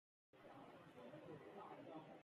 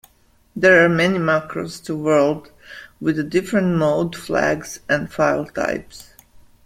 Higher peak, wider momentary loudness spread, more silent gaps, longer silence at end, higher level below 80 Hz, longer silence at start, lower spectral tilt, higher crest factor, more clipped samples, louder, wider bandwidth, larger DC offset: second, -46 dBFS vs -2 dBFS; second, 5 LU vs 15 LU; neither; second, 0 s vs 0.6 s; second, under -90 dBFS vs -52 dBFS; second, 0.35 s vs 0.55 s; about the same, -7 dB/octave vs -6 dB/octave; about the same, 14 dB vs 18 dB; neither; second, -60 LUFS vs -19 LUFS; second, 13 kHz vs 16 kHz; neither